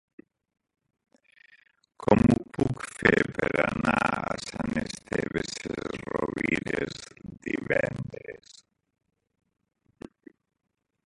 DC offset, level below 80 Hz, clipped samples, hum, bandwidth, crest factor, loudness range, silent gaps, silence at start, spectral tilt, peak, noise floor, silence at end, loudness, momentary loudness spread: under 0.1%; -50 dBFS; under 0.1%; none; 11.5 kHz; 28 dB; 9 LU; none; 2 s; -6 dB/octave; -2 dBFS; -59 dBFS; 2.75 s; -28 LUFS; 20 LU